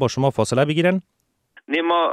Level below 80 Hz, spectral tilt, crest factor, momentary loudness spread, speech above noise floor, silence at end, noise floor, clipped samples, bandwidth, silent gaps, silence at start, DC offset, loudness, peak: -58 dBFS; -5.5 dB/octave; 16 dB; 6 LU; 35 dB; 0 s; -55 dBFS; under 0.1%; 13 kHz; none; 0 s; under 0.1%; -20 LUFS; -6 dBFS